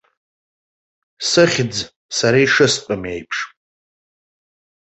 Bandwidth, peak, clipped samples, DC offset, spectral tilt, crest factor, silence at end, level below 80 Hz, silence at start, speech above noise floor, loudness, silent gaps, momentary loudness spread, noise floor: 8.4 kHz; -2 dBFS; under 0.1%; under 0.1%; -3.5 dB/octave; 18 dB; 1.4 s; -54 dBFS; 1.2 s; over 73 dB; -17 LUFS; 1.96-2.09 s; 12 LU; under -90 dBFS